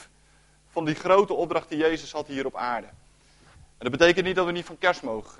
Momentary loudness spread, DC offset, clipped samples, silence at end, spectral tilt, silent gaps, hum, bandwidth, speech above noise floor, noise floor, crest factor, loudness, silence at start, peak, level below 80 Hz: 12 LU; under 0.1%; under 0.1%; 0.1 s; -5 dB/octave; none; none; 11.5 kHz; 34 dB; -59 dBFS; 22 dB; -25 LUFS; 0 s; -4 dBFS; -54 dBFS